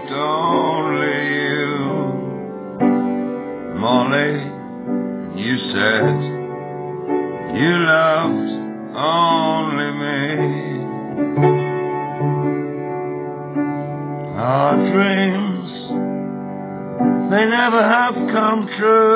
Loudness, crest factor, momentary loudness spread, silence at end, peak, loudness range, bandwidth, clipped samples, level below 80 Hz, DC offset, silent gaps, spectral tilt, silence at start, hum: -19 LUFS; 16 dB; 12 LU; 0 s; -2 dBFS; 3 LU; 4 kHz; under 0.1%; -58 dBFS; under 0.1%; none; -10 dB/octave; 0 s; none